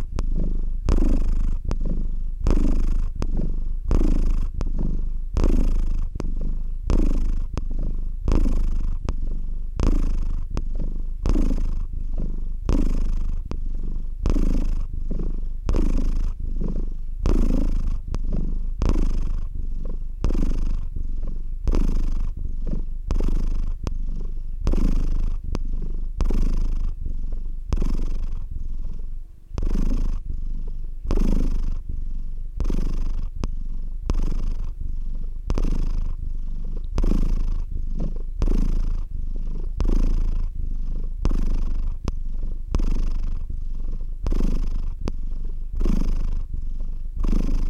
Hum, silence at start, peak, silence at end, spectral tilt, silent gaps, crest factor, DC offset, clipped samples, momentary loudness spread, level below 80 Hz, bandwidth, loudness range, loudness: none; 0 s; -6 dBFS; 0 s; -8 dB/octave; none; 14 dB; under 0.1%; under 0.1%; 9 LU; -22 dBFS; 6.6 kHz; 4 LU; -29 LUFS